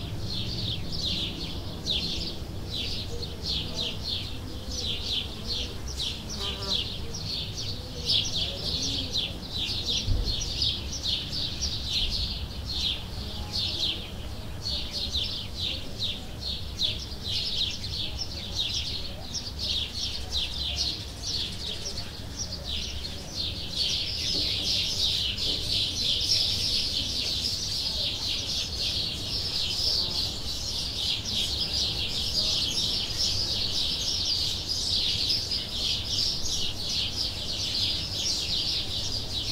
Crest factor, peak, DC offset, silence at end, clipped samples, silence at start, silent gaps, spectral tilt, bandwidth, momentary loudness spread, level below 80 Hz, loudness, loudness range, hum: 18 dB; -12 dBFS; under 0.1%; 0 s; under 0.1%; 0 s; none; -2.5 dB/octave; 16 kHz; 9 LU; -40 dBFS; -28 LUFS; 6 LU; none